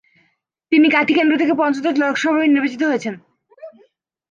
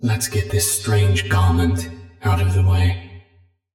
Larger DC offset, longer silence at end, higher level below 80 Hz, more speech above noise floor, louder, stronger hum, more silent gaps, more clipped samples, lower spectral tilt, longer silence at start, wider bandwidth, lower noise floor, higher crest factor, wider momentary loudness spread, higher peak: neither; about the same, 0.6 s vs 0.55 s; second, -70 dBFS vs -42 dBFS; first, 49 dB vs 39 dB; first, -16 LUFS vs -19 LUFS; neither; neither; neither; about the same, -4.5 dB/octave vs -5 dB/octave; first, 0.7 s vs 0 s; second, 7.4 kHz vs 17 kHz; first, -65 dBFS vs -56 dBFS; about the same, 16 dB vs 12 dB; about the same, 7 LU vs 9 LU; first, -2 dBFS vs -6 dBFS